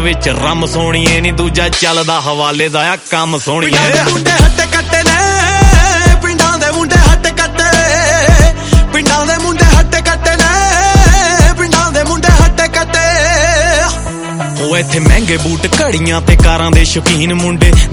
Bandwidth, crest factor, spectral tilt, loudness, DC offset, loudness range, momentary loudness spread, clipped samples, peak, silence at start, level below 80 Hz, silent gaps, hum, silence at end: 15.5 kHz; 8 dB; -4 dB/octave; -9 LUFS; under 0.1%; 2 LU; 5 LU; 3%; 0 dBFS; 0 s; -14 dBFS; none; none; 0 s